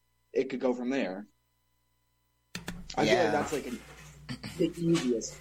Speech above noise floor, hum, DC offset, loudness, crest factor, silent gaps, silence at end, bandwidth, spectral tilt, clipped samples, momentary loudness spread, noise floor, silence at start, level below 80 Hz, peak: 45 dB; 60 Hz at -60 dBFS; under 0.1%; -30 LUFS; 20 dB; none; 0 s; 16.5 kHz; -5 dB/octave; under 0.1%; 17 LU; -74 dBFS; 0.35 s; -58 dBFS; -12 dBFS